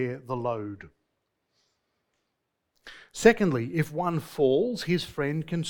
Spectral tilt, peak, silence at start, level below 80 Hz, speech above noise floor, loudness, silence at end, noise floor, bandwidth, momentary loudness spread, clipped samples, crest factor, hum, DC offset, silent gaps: -6 dB/octave; -4 dBFS; 0 s; -58 dBFS; 54 dB; -26 LUFS; 0 s; -80 dBFS; 19 kHz; 13 LU; under 0.1%; 24 dB; none; under 0.1%; none